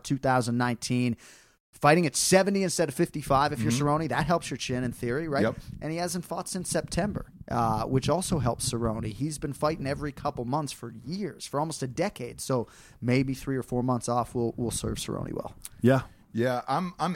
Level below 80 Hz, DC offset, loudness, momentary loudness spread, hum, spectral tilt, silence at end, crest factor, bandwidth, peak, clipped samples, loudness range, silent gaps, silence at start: -48 dBFS; under 0.1%; -28 LUFS; 10 LU; none; -5 dB/octave; 0 s; 20 dB; 16.5 kHz; -8 dBFS; under 0.1%; 6 LU; 1.60-1.73 s; 0.05 s